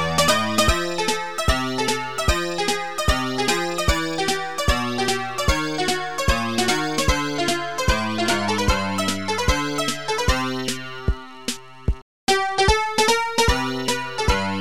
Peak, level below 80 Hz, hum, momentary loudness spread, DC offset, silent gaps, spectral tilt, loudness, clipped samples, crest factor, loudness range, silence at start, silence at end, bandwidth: -4 dBFS; -30 dBFS; none; 7 LU; 1%; 12.02-12.27 s; -3.5 dB/octave; -22 LUFS; under 0.1%; 18 dB; 2 LU; 0 s; 0 s; 17.5 kHz